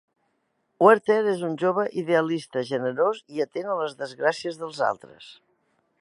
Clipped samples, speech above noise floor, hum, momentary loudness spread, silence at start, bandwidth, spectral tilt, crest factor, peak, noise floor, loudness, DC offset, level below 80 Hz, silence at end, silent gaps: under 0.1%; 49 dB; none; 11 LU; 0.8 s; 11.5 kHz; -6 dB/octave; 22 dB; -2 dBFS; -73 dBFS; -24 LUFS; under 0.1%; -78 dBFS; 0.7 s; none